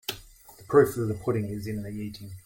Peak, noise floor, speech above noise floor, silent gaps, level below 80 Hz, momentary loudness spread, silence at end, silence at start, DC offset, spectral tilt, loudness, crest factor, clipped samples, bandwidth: -8 dBFS; -51 dBFS; 24 dB; none; -56 dBFS; 15 LU; 0.05 s; 0.1 s; under 0.1%; -6.5 dB/octave; -27 LUFS; 20 dB; under 0.1%; 17 kHz